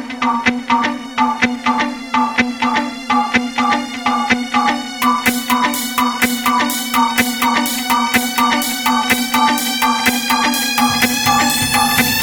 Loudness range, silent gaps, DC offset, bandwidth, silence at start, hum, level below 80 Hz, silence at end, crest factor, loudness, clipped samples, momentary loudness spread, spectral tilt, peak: 3 LU; none; under 0.1%; 17.5 kHz; 0 s; none; -46 dBFS; 0 s; 16 dB; -15 LUFS; under 0.1%; 4 LU; -2 dB/octave; 0 dBFS